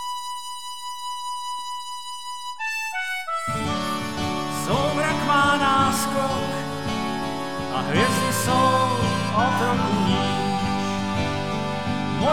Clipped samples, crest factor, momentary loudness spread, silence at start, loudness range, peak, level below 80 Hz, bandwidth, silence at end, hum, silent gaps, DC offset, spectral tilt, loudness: under 0.1%; 18 dB; 12 LU; 0 s; 7 LU; -6 dBFS; -48 dBFS; 19 kHz; 0 s; none; none; 1%; -4.5 dB/octave; -24 LUFS